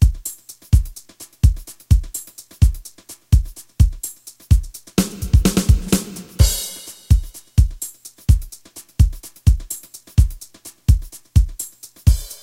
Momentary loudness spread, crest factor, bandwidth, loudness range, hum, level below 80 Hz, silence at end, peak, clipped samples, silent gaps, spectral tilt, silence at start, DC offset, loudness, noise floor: 16 LU; 18 dB; 16.5 kHz; 2 LU; none; -20 dBFS; 0.1 s; 0 dBFS; under 0.1%; none; -5.5 dB/octave; 0 s; under 0.1%; -20 LUFS; -42 dBFS